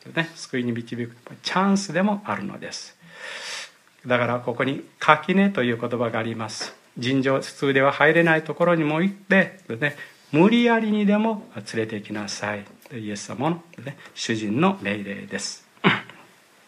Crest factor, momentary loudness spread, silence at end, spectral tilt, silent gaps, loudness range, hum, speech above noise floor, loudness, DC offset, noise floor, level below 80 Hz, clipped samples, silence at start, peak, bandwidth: 22 dB; 16 LU; 0.55 s; -5.5 dB/octave; none; 7 LU; none; 29 dB; -23 LUFS; under 0.1%; -52 dBFS; -70 dBFS; under 0.1%; 0.05 s; 0 dBFS; 12.5 kHz